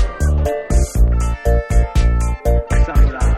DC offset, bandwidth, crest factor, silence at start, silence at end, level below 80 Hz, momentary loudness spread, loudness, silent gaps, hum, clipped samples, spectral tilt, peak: under 0.1%; 13 kHz; 12 dB; 0 s; 0 s; -14 dBFS; 3 LU; -17 LUFS; none; none; under 0.1%; -6.5 dB/octave; -2 dBFS